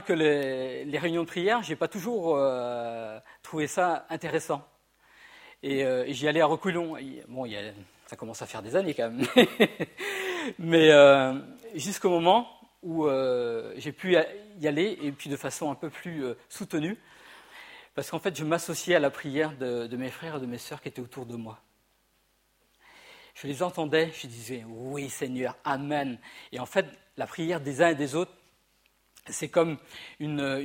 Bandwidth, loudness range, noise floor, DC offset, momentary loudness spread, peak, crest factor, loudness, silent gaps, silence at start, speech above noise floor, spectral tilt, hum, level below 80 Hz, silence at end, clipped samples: 16.5 kHz; 12 LU; -69 dBFS; under 0.1%; 16 LU; -4 dBFS; 26 dB; -27 LUFS; none; 0 s; 42 dB; -4.5 dB/octave; none; -70 dBFS; 0 s; under 0.1%